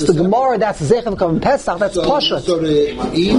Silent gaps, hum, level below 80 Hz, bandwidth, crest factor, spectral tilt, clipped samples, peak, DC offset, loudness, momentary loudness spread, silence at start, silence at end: none; none; -36 dBFS; 11 kHz; 14 dB; -5.5 dB/octave; under 0.1%; 0 dBFS; under 0.1%; -16 LUFS; 4 LU; 0 s; 0 s